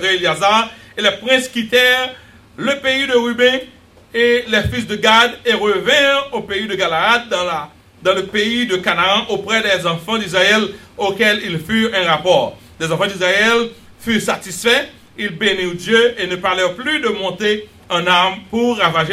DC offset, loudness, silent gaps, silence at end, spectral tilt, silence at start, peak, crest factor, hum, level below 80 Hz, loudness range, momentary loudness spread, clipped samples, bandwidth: under 0.1%; -15 LUFS; none; 0 s; -3.5 dB/octave; 0 s; 0 dBFS; 16 dB; none; -48 dBFS; 2 LU; 9 LU; under 0.1%; 16 kHz